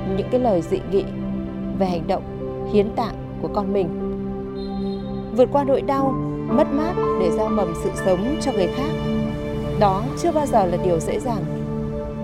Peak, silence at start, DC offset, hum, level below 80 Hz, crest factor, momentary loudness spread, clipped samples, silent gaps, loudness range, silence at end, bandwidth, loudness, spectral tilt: -4 dBFS; 0 s; under 0.1%; none; -38 dBFS; 18 dB; 8 LU; under 0.1%; none; 3 LU; 0 s; 14.5 kHz; -22 LUFS; -7 dB/octave